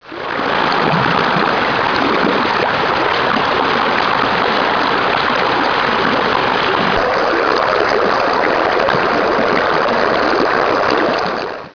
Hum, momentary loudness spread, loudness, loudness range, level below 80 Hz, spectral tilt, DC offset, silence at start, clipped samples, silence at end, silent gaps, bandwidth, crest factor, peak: none; 1 LU; -14 LUFS; 0 LU; -44 dBFS; -5 dB/octave; 0.3%; 0.05 s; under 0.1%; 0.05 s; none; 5.4 kHz; 12 dB; -2 dBFS